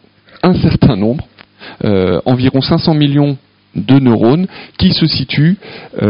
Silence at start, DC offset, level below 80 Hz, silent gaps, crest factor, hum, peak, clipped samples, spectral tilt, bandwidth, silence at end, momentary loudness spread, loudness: 0.45 s; under 0.1%; -34 dBFS; none; 12 dB; none; 0 dBFS; under 0.1%; -10.5 dB/octave; 5.4 kHz; 0 s; 12 LU; -12 LUFS